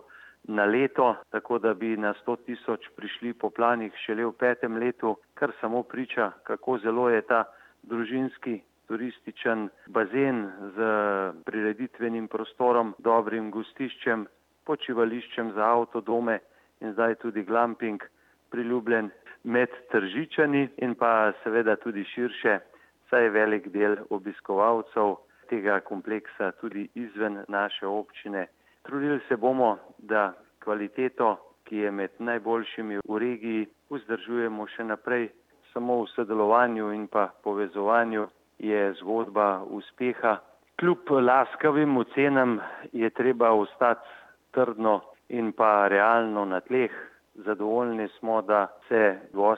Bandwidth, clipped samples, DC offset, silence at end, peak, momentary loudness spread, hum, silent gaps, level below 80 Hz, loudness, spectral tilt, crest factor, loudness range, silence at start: 5.2 kHz; under 0.1%; under 0.1%; 0 s; -8 dBFS; 12 LU; none; none; -78 dBFS; -27 LUFS; -7.5 dB/octave; 20 dB; 5 LU; 0.5 s